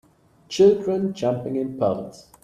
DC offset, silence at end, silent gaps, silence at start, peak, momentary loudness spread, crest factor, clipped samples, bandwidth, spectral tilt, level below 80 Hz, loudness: under 0.1%; 0.35 s; none; 0.5 s; -6 dBFS; 14 LU; 16 dB; under 0.1%; 9.6 kHz; -6.5 dB/octave; -60 dBFS; -22 LUFS